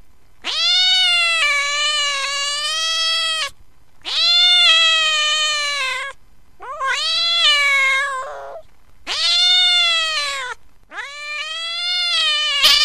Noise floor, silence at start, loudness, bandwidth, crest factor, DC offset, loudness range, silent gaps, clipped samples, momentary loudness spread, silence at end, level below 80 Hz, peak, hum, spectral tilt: -49 dBFS; 0.45 s; -14 LUFS; 15.5 kHz; 18 dB; 0.9%; 3 LU; none; under 0.1%; 18 LU; 0 s; -52 dBFS; 0 dBFS; none; 3 dB/octave